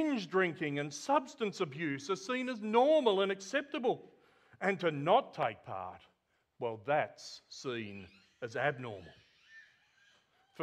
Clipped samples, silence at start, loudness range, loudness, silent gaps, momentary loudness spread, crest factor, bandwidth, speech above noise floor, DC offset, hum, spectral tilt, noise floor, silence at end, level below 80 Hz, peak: under 0.1%; 0 s; 8 LU; -34 LUFS; none; 15 LU; 22 dB; 11.5 kHz; 43 dB; under 0.1%; none; -5 dB/octave; -77 dBFS; 0 s; -80 dBFS; -14 dBFS